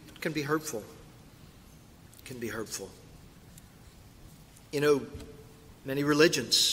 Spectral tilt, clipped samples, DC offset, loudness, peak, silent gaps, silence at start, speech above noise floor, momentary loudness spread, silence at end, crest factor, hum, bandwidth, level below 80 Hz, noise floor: -3 dB/octave; under 0.1%; under 0.1%; -29 LUFS; -8 dBFS; none; 0 s; 25 dB; 26 LU; 0 s; 26 dB; none; 16 kHz; -58 dBFS; -54 dBFS